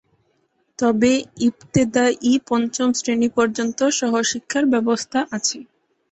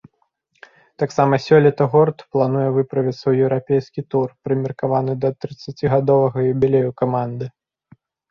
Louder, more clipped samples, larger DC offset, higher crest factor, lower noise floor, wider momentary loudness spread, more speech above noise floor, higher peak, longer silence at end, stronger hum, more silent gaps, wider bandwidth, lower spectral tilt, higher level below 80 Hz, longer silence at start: about the same, -20 LUFS vs -18 LUFS; neither; neither; about the same, 16 dB vs 16 dB; about the same, -66 dBFS vs -67 dBFS; second, 5 LU vs 9 LU; about the same, 47 dB vs 49 dB; about the same, -4 dBFS vs -2 dBFS; second, 0.5 s vs 0.8 s; neither; neither; first, 8.4 kHz vs 7.2 kHz; second, -4 dB/octave vs -8.5 dB/octave; about the same, -58 dBFS vs -54 dBFS; second, 0.8 s vs 1 s